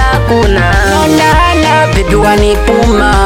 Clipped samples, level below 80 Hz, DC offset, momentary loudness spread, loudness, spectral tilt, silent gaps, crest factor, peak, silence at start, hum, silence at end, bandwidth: under 0.1%; -14 dBFS; under 0.1%; 2 LU; -8 LUFS; -5 dB/octave; none; 8 dB; 0 dBFS; 0 s; none; 0 s; 16.5 kHz